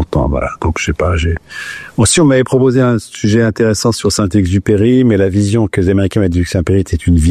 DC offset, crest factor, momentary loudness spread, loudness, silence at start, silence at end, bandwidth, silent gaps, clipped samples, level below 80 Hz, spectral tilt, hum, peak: under 0.1%; 10 dB; 7 LU; -12 LUFS; 0 s; 0 s; 14 kHz; none; under 0.1%; -28 dBFS; -5.5 dB/octave; none; -2 dBFS